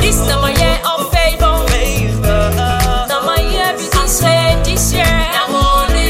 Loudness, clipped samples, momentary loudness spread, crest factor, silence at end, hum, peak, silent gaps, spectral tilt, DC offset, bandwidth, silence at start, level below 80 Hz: -13 LUFS; under 0.1%; 3 LU; 12 dB; 0 s; none; 0 dBFS; none; -4 dB/octave; under 0.1%; 16.5 kHz; 0 s; -16 dBFS